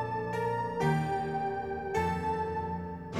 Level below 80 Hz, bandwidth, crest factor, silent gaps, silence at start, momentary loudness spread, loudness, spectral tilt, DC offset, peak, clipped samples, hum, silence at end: -54 dBFS; 15 kHz; 16 dB; none; 0 s; 6 LU; -32 LUFS; -7 dB/octave; under 0.1%; -16 dBFS; under 0.1%; none; 0 s